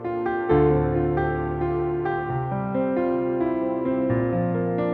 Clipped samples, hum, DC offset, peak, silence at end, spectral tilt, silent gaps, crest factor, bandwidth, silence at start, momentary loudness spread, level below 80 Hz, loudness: under 0.1%; none; under 0.1%; -8 dBFS; 0 s; -11.5 dB/octave; none; 14 dB; 4.2 kHz; 0 s; 6 LU; -40 dBFS; -24 LUFS